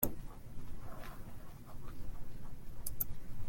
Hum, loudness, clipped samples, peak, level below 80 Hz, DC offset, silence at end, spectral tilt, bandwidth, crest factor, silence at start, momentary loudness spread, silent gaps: none; -47 LUFS; under 0.1%; -14 dBFS; -48 dBFS; under 0.1%; 0 s; -5 dB/octave; 17 kHz; 24 dB; 0 s; 13 LU; none